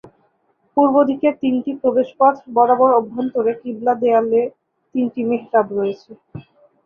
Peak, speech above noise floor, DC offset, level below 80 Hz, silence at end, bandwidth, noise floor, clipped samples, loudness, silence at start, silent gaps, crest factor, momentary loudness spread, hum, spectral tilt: -2 dBFS; 46 dB; under 0.1%; -62 dBFS; 0.45 s; 5.6 kHz; -63 dBFS; under 0.1%; -18 LUFS; 0.75 s; none; 16 dB; 10 LU; none; -9 dB/octave